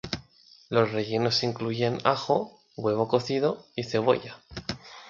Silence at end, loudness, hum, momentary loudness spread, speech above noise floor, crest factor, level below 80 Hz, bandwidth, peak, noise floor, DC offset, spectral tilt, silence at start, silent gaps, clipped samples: 0 s; -27 LUFS; none; 12 LU; 30 dB; 22 dB; -58 dBFS; 7.6 kHz; -6 dBFS; -56 dBFS; under 0.1%; -5.5 dB/octave; 0.05 s; none; under 0.1%